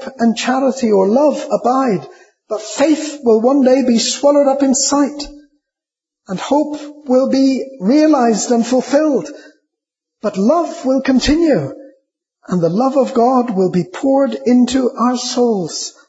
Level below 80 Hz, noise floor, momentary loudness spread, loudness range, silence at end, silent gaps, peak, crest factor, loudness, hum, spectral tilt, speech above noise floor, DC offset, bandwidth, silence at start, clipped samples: -44 dBFS; -86 dBFS; 11 LU; 3 LU; 0.2 s; none; -2 dBFS; 14 dB; -14 LUFS; none; -4.5 dB/octave; 72 dB; under 0.1%; 8 kHz; 0 s; under 0.1%